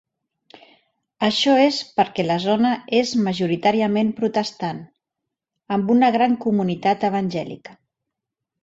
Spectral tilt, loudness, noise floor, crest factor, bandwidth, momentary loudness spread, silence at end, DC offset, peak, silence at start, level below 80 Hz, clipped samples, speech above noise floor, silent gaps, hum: -5.5 dB/octave; -20 LUFS; -83 dBFS; 18 dB; 8 kHz; 10 LU; 1.1 s; under 0.1%; -4 dBFS; 1.2 s; -64 dBFS; under 0.1%; 64 dB; none; none